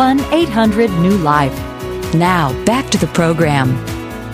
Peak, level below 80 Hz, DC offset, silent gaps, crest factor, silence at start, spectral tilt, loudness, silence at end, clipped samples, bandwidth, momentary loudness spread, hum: 0 dBFS; -34 dBFS; under 0.1%; none; 14 dB; 0 s; -6 dB/octave; -14 LUFS; 0 s; under 0.1%; 16 kHz; 11 LU; none